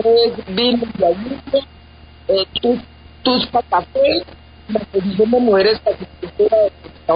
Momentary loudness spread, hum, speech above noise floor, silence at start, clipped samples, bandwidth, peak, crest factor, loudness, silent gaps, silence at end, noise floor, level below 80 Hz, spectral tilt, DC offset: 10 LU; none; 26 dB; 0 s; under 0.1%; 5.2 kHz; -2 dBFS; 14 dB; -17 LUFS; none; 0 s; -42 dBFS; -44 dBFS; -10.5 dB/octave; 0.1%